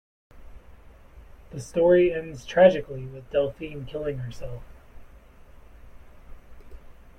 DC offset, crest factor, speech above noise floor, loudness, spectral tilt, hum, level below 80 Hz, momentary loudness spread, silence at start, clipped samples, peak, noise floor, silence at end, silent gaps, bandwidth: under 0.1%; 22 dB; 25 dB; -24 LUFS; -6.5 dB/octave; none; -48 dBFS; 21 LU; 0.35 s; under 0.1%; -4 dBFS; -49 dBFS; 0.25 s; none; 10 kHz